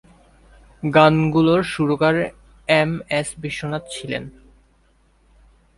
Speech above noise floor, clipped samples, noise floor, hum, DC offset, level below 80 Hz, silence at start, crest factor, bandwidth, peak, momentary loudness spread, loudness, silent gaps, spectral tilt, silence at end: 40 dB; under 0.1%; -58 dBFS; none; under 0.1%; -50 dBFS; 0.85 s; 20 dB; 11.5 kHz; 0 dBFS; 14 LU; -19 LUFS; none; -6 dB/octave; 1.5 s